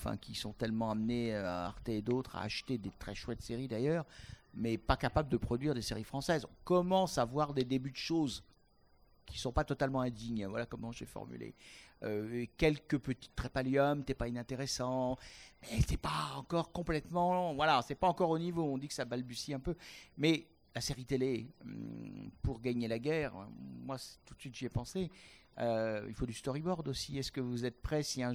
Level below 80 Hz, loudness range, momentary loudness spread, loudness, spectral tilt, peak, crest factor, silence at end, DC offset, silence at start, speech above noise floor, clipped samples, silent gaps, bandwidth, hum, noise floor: -52 dBFS; 6 LU; 14 LU; -37 LUFS; -5.5 dB/octave; -14 dBFS; 24 dB; 0 s; under 0.1%; 0 s; 32 dB; under 0.1%; none; 19 kHz; none; -69 dBFS